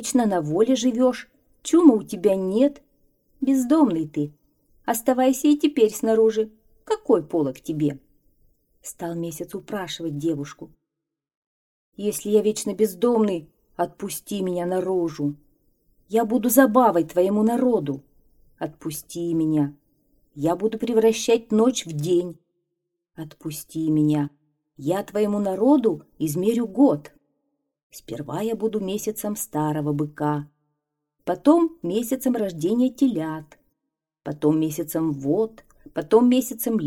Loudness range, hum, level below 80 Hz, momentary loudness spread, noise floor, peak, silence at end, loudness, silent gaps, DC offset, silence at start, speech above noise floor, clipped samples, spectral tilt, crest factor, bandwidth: 6 LU; none; -60 dBFS; 14 LU; -85 dBFS; -2 dBFS; 0 s; -22 LUFS; 11.37-11.92 s, 27.83-27.90 s; under 0.1%; 0 s; 63 dB; under 0.1%; -6 dB/octave; 20 dB; 17 kHz